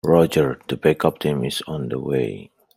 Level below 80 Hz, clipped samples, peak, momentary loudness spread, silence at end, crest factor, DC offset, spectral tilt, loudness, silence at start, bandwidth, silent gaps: -52 dBFS; under 0.1%; -2 dBFS; 10 LU; 0.35 s; 18 dB; under 0.1%; -6.5 dB/octave; -21 LUFS; 0.05 s; 16 kHz; none